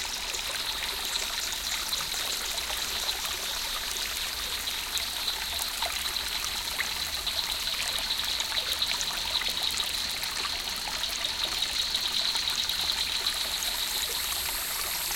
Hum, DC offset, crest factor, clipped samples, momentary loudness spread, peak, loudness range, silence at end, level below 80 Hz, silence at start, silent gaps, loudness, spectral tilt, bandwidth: none; under 0.1%; 22 dB; under 0.1%; 3 LU; -8 dBFS; 2 LU; 0 s; -50 dBFS; 0 s; none; -28 LUFS; 0.5 dB/octave; 17 kHz